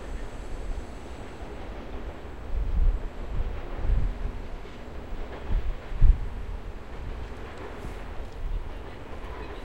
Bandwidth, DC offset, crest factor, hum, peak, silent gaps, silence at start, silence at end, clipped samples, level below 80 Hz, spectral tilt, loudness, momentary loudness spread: 8.2 kHz; 0.7%; 22 dB; none; -6 dBFS; none; 0 s; 0 s; under 0.1%; -30 dBFS; -7 dB/octave; -35 LUFS; 12 LU